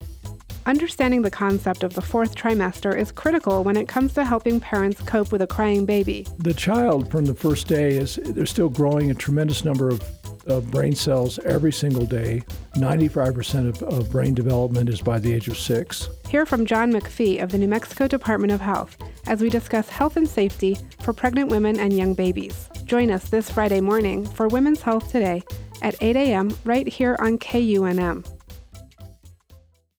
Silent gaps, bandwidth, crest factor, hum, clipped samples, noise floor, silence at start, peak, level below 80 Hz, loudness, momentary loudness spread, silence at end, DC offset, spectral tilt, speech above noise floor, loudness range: none; over 20 kHz; 14 dB; none; under 0.1%; -52 dBFS; 0 s; -8 dBFS; -40 dBFS; -22 LUFS; 7 LU; 0.45 s; under 0.1%; -6.5 dB/octave; 31 dB; 1 LU